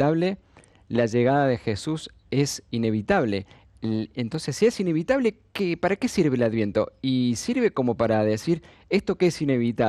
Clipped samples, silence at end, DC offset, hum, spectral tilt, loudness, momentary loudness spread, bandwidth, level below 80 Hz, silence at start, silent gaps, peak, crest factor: under 0.1%; 0 s; under 0.1%; none; -6 dB/octave; -24 LUFS; 7 LU; 13 kHz; -54 dBFS; 0 s; none; -8 dBFS; 16 dB